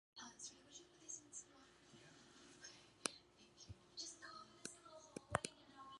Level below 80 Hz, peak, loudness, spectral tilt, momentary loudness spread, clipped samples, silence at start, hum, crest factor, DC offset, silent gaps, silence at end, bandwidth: -74 dBFS; -18 dBFS; -52 LUFS; -2 dB/octave; 18 LU; under 0.1%; 0.15 s; none; 38 dB; under 0.1%; none; 0 s; 11.5 kHz